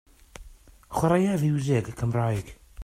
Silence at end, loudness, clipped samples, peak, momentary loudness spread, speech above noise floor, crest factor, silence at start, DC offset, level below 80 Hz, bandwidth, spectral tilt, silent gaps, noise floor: 0 s; -26 LUFS; under 0.1%; -10 dBFS; 11 LU; 26 dB; 18 dB; 0.4 s; under 0.1%; -48 dBFS; 16 kHz; -7.5 dB/octave; none; -50 dBFS